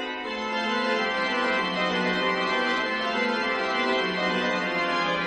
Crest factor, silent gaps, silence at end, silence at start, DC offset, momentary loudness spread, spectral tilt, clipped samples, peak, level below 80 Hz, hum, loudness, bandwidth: 14 dB; none; 0 s; 0 s; under 0.1%; 2 LU; -4 dB/octave; under 0.1%; -12 dBFS; -60 dBFS; none; -25 LUFS; 9.8 kHz